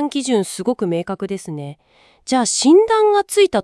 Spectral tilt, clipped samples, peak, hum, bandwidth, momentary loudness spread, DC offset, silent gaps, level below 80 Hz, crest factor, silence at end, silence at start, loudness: -4 dB/octave; under 0.1%; -2 dBFS; none; 12 kHz; 18 LU; under 0.1%; none; -58 dBFS; 14 dB; 0 s; 0 s; -17 LUFS